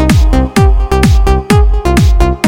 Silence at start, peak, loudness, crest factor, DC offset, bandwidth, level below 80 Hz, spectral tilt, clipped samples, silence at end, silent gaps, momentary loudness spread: 0 s; 0 dBFS; -10 LUFS; 8 dB; under 0.1%; 16 kHz; -10 dBFS; -6.5 dB/octave; 1%; 0 s; none; 1 LU